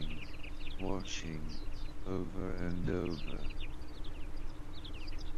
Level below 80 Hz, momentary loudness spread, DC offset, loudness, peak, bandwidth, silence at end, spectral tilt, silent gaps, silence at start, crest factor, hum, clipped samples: -40 dBFS; 11 LU; under 0.1%; -43 LUFS; -20 dBFS; 7.6 kHz; 0 s; -5.5 dB/octave; none; 0 s; 16 dB; none; under 0.1%